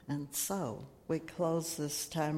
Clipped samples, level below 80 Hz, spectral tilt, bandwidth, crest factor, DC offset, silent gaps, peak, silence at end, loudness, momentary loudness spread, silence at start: under 0.1%; -66 dBFS; -4.5 dB/octave; 16.5 kHz; 16 dB; under 0.1%; none; -22 dBFS; 0 s; -36 LUFS; 5 LU; 0 s